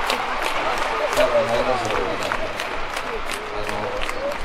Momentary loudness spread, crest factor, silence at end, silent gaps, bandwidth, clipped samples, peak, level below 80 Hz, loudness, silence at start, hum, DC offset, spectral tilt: 8 LU; 18 dB; 0 s; none; 16 kHz; under 0.1%; -4 dBFS; -36 dBFS; -23 LUFS; 0 s; none; under 0.1%; -3 dB/octave